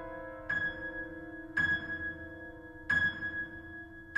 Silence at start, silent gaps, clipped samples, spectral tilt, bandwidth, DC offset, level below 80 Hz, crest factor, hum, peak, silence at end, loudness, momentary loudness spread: 0 s; none; under 0.1%; -5 dB/octave; 9.4 kHz; under 0.1%; -56 dBFS; 18 dB; none; -20 dBFS; 0 s; -34 LUFS; 17 LU